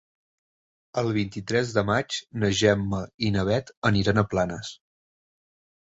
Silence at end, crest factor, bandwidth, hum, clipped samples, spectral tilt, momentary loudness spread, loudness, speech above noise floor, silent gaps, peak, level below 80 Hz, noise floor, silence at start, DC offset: 1.2 s; 20 dB; 8 kHz; none; under 0.1%; -5.5 dB/octave; 8 LU; -25 LUFS; over 65 dB; 3.14-3.18 s, 3.77-3.82 s; -6 dBFS; -48 dBFS; under -90 dBFS; 0.95 s; under 0.1%